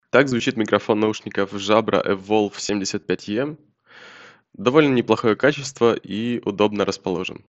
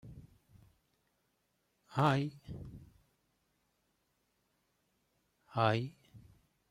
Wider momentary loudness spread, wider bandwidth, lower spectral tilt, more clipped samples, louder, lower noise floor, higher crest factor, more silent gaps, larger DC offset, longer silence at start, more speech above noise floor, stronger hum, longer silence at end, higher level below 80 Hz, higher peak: second, 8 LU vs 22 LU; second, 8.2 kHz vs 13.5 kHz; second, -5 dB/octave vs -7 dB/octave; neither; first, -21 LUFS vs -34 LUFS; second, -46 dBFS vs -80 dBFS; second, 20 dB vs 26 dB; neither; neither; about the same, 0.15 s vs 0.05 s; second, 26 dB vs 47 dB; neither; second, 0.15 s vs 0.5 s; first, -60 dBFS vs -68 dBFS; first, 0 dBFS vs -14 dBFS